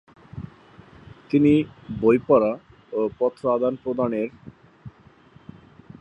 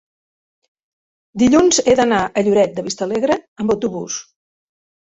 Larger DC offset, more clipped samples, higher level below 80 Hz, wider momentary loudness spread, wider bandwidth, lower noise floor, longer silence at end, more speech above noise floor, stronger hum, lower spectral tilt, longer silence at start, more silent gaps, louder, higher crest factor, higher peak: neither; neither; about the same, -54 dBFS vs -50 dBFS; first, 21 LU vs 13 LU; about the same, 8.2 kHz vs 8.4 kHz; second, -52 dBFS vs under -90 dBFS; first, 1.1 s vs 0.8 s; second, 31 dB vs over 74 dB; neither; first, -9 dB/octave vs -4 dB/octave; second, 0.35 s vs 1.35 s; second, none vs 3.48-3.56 s; second, -22 LUFS vs -16 LUFS; about the same, 20 dB vs 16 dB; about the same, -4 dBFS vs -2 dBFS